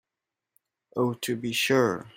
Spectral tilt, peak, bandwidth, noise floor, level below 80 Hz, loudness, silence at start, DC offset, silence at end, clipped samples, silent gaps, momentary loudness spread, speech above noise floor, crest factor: -4.5 dB/octave; -8 dBFS; 16 kHz; -88 dBFS; -70 dBFS; -26 LUFS; 0.95 s; under 0.1%; 0.1 s; under 0.1%; none; 8 LU; 62 dB; 20 dB